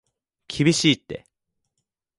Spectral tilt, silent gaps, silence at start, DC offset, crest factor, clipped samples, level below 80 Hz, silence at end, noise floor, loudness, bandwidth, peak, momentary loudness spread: -4 dB/octave; none; 0.5 s; under 0.1%; 22 dB; under 0.1%; -58 dBFS; 1 s; -80 dBFS; -20 LUFS; 11.5 kHz; -4 dBFS; 20 LU